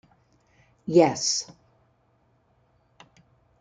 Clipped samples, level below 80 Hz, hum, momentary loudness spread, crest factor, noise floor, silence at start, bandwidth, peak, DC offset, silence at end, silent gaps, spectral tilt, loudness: under 0.1%; -68 dBFS; none; 20 LU; 24 dB; -66 dBFS; 0.85 s; 9.4 kHz; -4 dBFS; under 0.1%; 2.15 s; none; -4 dB/octave; -22 LUFS